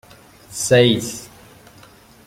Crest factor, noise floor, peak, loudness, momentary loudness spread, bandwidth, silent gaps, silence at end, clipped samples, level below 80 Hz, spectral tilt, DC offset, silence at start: 20 dB; -47 dBFS; -2 dBFS; -17 LUFS; 20 LU; 16.5 kHz; none; 1 s; under 0.1%; -54 dBFS; -4 dB/octave; under 0.1%; 0.5 s